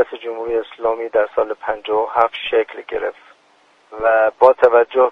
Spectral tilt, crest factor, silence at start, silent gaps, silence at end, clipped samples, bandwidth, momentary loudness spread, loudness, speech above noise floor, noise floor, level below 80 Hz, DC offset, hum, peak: -5 dB/octave; 18 dB; 0 s; none; 0 s; under 0.1%; 5.4 kHz; 12 LU; -17 LUFS; 38 dB; -54 dBFS; -54 dBFS; under 0.1%; none; 0 dBFS